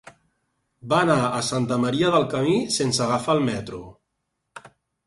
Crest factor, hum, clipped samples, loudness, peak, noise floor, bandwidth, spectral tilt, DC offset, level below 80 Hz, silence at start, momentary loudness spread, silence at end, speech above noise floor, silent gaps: 18 dB; none; under 0.1%; -22 LUFS; -6 dBFS; -78 dBFS; 11.5 kHz; -5 dB/octave; under 0.1%; -56 dBFS; 0.85 s; 7 LU; 0.4 s; 56 dB; none